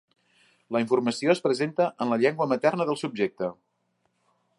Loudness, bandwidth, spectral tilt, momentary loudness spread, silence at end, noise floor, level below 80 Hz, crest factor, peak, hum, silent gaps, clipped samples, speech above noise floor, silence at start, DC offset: -26 LUFS; 11.5 kHz; -5.5 dB/octave; 5 LU; 1.05 s; -73 dBFS; -74 dBFS; 20 dB; -6 dBFS; none; none; under 0.1%; 48 dB; 0.7 s; under 0.1%